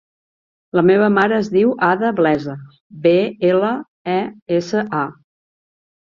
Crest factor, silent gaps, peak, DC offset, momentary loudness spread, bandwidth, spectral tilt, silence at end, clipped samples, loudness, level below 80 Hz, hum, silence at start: 16 dB; 2.80-2.90 s, 3.88-4.05 s, 4.42-4.46 s; -2 dBFS; under 0.1%; 9 LU; 7.2 kHz; -7 dB/octave; 1 s; under 0.1%; -17 LUFS; -60 dBFS; none; 0.75 s